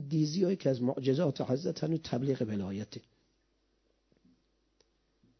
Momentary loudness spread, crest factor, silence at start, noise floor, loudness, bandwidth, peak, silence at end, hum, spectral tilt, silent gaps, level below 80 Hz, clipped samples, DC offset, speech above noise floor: 9 LU; 18 dB; 0 s; -75 dBFS; -32 LUFS; 6.4 kHz; -16 dBFS; 2.4 s; none; -7.5 dB/octave; none; -66 dBFS; under 0.1%; under 0.1%; 43 dB